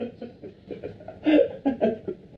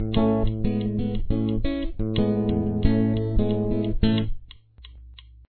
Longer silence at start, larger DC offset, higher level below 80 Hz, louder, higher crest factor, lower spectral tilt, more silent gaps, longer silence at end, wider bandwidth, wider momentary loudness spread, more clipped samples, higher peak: about the same, 0 s vs 0 s; neither; second, -60 dBFS vs -30 dBFS; about the same, -24 LUFS vs -25 LUFS; about the same, 18 dB vs 18 dB; second, -8.5 dB/octave vs -11.5 dB/octave; neither; second, 0 s vs 0.4 s; first, 5.2 kHz vs 4.5 kHz; first, 20 LU vs 6 LU; neither; second, -8 dBFS vs -4 dBFS